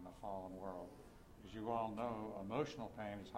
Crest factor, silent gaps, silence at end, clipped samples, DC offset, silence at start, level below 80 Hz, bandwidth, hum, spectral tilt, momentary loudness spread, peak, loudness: 20 dB; none; 0 s; under 0.1%; under 0.1%; 0 s; -66 dBFS; 16 kHz; none; -6.5 dB/octave; 15 LU; -28 dBFS; -46 LUFS